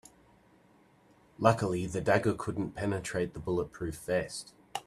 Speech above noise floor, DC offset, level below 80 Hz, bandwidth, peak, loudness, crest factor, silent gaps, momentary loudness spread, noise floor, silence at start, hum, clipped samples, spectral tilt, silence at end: 32 dB; under 0.1%; -58 dBFS; 13.5 kHz; -8 dBFS; -32 LUFS; 26 dB; none; 11 LU; -63 dBFS; 1.4 s; none; under 0.1%; -6 dB/octave; 0.05 s